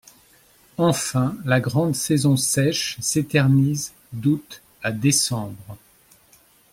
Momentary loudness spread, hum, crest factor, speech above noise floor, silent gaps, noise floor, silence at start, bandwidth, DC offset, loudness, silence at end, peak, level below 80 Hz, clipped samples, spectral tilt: 11 LU; none; 18 dB; 35 dB; none; -55 dBFS; 0.8 s; 16.5 kHz; under 0.1%; -21 LUFS; 0.95 s; -4 dBFS; -56 dBFS; under 0.1%; -4.5 dB/octave